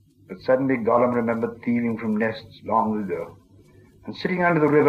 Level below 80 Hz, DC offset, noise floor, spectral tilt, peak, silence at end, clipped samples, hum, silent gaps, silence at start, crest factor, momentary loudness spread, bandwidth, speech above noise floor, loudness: -60 dBFS; under 0.1%; -52 dBFS; -8.5 dB/octave; -6 dBFS; 0 s; under 0.1%; none; none; 0.3 s; 16 dB; 16 LU; 6.8 kHz; 30 dB; -23 LUFS